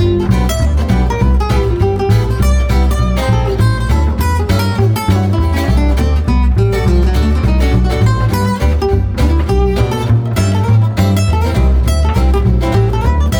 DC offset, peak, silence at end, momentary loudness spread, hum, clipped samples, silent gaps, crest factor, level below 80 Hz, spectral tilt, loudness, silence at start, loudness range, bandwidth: under 0.1%; 0 dBFS; 0 s; 2 LU; none; under 0.1%; none; 10 dB; -14 dBFS; -7 dB/octave; -13 LUFS; 0 s; 1 LU; 17 kHz